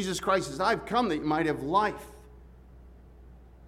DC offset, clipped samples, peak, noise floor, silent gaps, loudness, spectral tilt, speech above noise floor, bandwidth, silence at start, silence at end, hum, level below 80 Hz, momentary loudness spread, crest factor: under 0.1%; under 0.1%; -12 dBFS; -51 dBFS; none; -28 LUFS; -4.5 dB/octave; 23 dB; 16 kHz; 0 s; 0 s; none; -52 dBFS; 5 LU; 18 dB